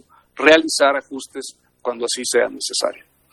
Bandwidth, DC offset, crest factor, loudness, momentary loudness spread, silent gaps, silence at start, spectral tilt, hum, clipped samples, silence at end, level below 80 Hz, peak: 12.5 kHz; under 0.1%; 20 dB; -18 LUFS; 18 LU; none; 0.35 s; -1 dB/octave; none; under 0.1%; 0.35 s; -62 dBFS; 0 dBFS